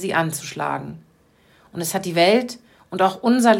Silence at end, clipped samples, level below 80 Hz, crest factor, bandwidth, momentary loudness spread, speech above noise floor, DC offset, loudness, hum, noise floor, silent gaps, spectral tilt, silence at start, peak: 0 s; under 0.1%; -64 dBFS; 18 dB; 16.5 kHz; 18 LU; 37 dB; under 0.1%; -21 LUFS; none; -56 dBFS; none; -4.5 dB/octave; 0 s; -2 dBFS